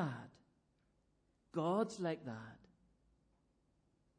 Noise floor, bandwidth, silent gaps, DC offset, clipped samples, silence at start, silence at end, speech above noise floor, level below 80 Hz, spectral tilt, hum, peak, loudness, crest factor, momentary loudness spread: -78 dBFS; 10.5 kHz; none; under 0.1%; under 0.1%; 0 s; 1.6 s; 38 dB; -80 dBFS; -6.5 dB/octave; none; -24 dBFS; -41 LUFS; 20 dB; 18 LU